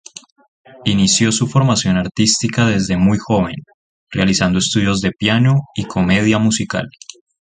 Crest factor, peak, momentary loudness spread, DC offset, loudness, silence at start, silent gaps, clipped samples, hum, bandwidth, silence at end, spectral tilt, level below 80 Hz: 16 dB; 0 dBFS; 10 LU; under 0.1%; -15 LUFS; 0.75 s; 2.11-2.15 s, 3.74-4.07 s; under 0.1%; none; 9.6 kHz; 0.6 s; -4.5 dB/octave; -40 dBFS